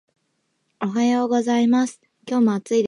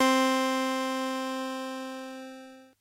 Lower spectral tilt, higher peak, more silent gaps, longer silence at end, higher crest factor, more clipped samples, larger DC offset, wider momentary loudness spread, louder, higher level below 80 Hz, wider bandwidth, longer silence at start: first, -5.5 dB/octave vs -1.5 dB/octave; first, -8 dBFS vs -12 dBFS; neither; second, 0 s vs 0.15 s; second, 12 dB vs 18 dB; neither; neither; second, 8 LU vs 18 LU; first, -21 LUFS vs -29 LUFS; first, -74 dBFS vs -84 dBFS; second, 10.5 kHz vs 16 kHz; first, 0.8 s vs 0 s